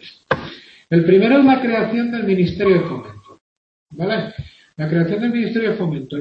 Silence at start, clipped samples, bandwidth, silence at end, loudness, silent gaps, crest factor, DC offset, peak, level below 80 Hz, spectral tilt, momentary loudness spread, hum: 0 s; under 0.1%; 6 kHz; 0 s; -17 LUFS; 3.41-3.86 s; 16 dB; under 0.1%; -2 dBFS; -50 dBFS; -9 dB/octave; 15 LU; none